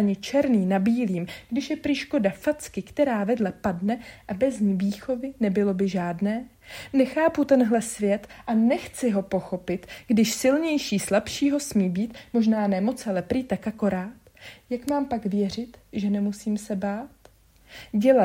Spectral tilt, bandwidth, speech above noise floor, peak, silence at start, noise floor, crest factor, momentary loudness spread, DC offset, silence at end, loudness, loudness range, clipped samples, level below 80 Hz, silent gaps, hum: -6 dB/octave; 16 kHz; 31 dB; -6 dBFS; 0 s; -56 dBFS; 18 dB; 10 LU; under 0.1%; 0 s; -25 LUFS; 4 LU; under 0.1%; -56 dBFS; none; none